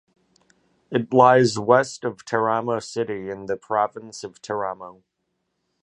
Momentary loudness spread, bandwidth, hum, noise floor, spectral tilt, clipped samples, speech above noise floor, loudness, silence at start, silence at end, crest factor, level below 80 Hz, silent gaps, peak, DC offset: 19 LU; 11 kHz; none; -76 dBFS; -5.5 dB/octave; under 0.1%; 54 dB; -22 LUFS; 0.9 s; 0.9 s; 22 dB; -64 dBFS; none; -2 dBFS; under 0.1%